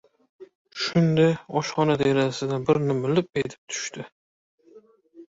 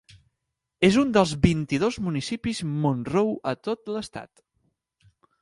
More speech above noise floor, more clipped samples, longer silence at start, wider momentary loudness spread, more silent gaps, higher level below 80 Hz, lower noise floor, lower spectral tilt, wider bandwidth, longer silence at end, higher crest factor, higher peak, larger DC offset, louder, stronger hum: second, 30 dB vs 58 dB; neither; second, 0.4 s vs 0.8 s; about the same, 12 LU vs 11 LU; first, 0.55-0.65 s, 3.58-3.67 s, 4.12-4.58 s vs none; second, -60 dBFS vs -46 dBFS; second, -53 dBFS vs -82 dBFS; about the same, -6 dB/octave vs -6 dB/octave; second, 8 kHz vs 11.5 kHz; second, 0.1 s vs 1.15 s; about the same, 18 dB vs 20 dB; second, -8 dBFS vs -4 dBFS; neither; about the same, -24 LUFS vs -24 LUFS; neither